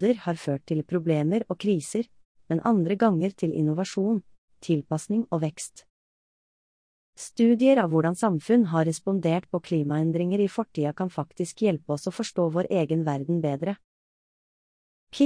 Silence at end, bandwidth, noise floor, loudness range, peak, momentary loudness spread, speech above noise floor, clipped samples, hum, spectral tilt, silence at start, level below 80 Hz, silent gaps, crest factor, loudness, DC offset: 0 s; 10.5 kHz; under -90 dBFS; 5 LU; -8 dBFS; 9 LU; over 65 dB; under 0.1%; none; -7 dB/octave; 0 s; -68 dBFS; 2.25-2.35 s, 4.38-4.48 s, 5.90-7.13 s, 13.84-15.07 s; 18 dB; -26 LUFS; under 0.1%